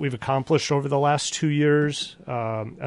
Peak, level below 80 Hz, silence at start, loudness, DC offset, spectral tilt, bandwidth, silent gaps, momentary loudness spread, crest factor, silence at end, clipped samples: -8 dBFS; -60 dBFS; 0 s; -23 LUFS; under 0.1%; -5 dB/octave; 11.5 kHz; none; 9 LU; 14 dB; 0 s; under 0.1%